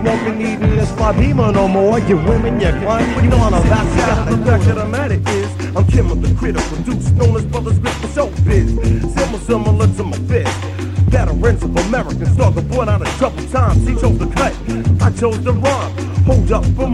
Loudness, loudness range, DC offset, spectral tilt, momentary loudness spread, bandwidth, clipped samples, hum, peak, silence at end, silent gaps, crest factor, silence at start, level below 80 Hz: -15 LUFS; 2 LU; under 0.1%; -7 dB/octave; 6 LU; 11 kHz; under 0.1%; none; 0 dBFS; 0 s; none; 14 dB; 0 s; -22 dBFS